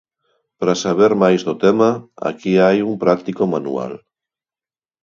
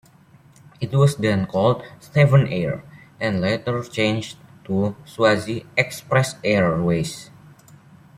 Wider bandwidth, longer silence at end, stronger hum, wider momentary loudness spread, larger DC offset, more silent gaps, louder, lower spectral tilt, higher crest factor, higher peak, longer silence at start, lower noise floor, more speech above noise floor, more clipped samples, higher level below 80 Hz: second, 7.6 kHz vs 13.5 kHz; about the same, 1.05 s vs 0.95 s; neither; about the same, 11 LU vs 10 LU; neither; neither; first, -17 LUFS vs -21 LUFS; about the same, -6 dB/octave vs -6.5 dB/octave; about the same, 18 dB vs 18 dB; about the same, 0 dBFS vs -2 dBFS; second, 0.6 s vs 0.8 s; first, under -90 dBFS vs -51 dBFS; first, over 74 dB vs 31 dB; neither; second, -60 dBFS vs -54 dBFS